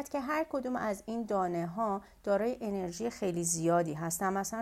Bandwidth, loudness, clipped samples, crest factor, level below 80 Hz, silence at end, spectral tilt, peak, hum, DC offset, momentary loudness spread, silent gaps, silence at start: 16 kHz; -33 LUFS; under 0.1%; 16 dB; -62 dBFS; 0 s; -5 dB/octave; -18 dBFS; none; under 0.1%; 6 LU; none; 0 s